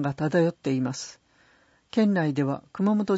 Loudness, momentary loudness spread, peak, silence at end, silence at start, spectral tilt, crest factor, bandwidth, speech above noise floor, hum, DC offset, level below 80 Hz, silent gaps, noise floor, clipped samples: -26 LUFS; 8 LU; -10 dBFS; 0 s; 0 s; -7 dB/octave; 16 dB; 8 kHz; 37 dB; none; under 0.1%; -66 dBFS; none; -61 dBFS; under 0.1%